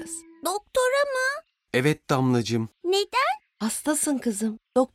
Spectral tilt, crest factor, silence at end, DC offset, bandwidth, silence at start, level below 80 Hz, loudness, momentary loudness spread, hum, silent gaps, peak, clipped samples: -4 dB/octave; 16 dB; 0.1 s; under 0.1%; 16 kHz; 0 s; -62 dBFS; -25 LUFS; 7 LU; none; none; -8 dBFS; under 0.1%